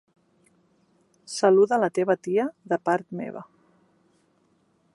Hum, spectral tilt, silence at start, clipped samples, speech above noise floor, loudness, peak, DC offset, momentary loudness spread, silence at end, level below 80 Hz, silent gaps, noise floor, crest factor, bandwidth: none; -5.5 dB/octave; 1.3 s; under 0.1%; 43 dB; -24 LUFS; -6 dBFS; under 0.1%; 16 LU; 1.5 s; -78 dBFS; none; -66 dBFS; 20 dB; 11.5 kHz